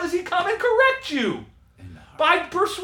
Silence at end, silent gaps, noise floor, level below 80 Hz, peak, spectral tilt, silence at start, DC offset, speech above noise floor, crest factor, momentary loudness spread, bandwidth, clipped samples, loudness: 0 s; none; -44 dBFS; -56 dBFS; -4 dBFS; -3.5 dB/octave; 0 s; under 0.1%; 22 dB; 18 dB; 7 LU; 18.5 kHz; under 0.1%; -21 LUFS